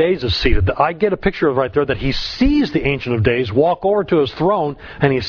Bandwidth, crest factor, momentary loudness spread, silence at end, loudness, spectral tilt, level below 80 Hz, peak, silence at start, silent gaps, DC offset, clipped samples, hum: 5.4 kHz; 16 dB; 4 LU; 0 s; -17 LUFS; -7.5 dB/octave; -28 dBFS; 0 dBFS; 0 s; none; under 0.1%; under 0.1%; none